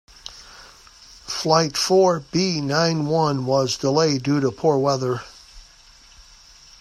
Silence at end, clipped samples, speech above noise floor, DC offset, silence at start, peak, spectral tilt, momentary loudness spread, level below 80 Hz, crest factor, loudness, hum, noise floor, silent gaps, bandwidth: 1.2 s; under 0.1%; 30 dB; under 0.1%; 0.25 s; -2 dBFS; -5 dB/octave; 21 LU; -54 dBFS; 20 dB; -20 LUFS; none; -49 dBFS; none; 14 kHz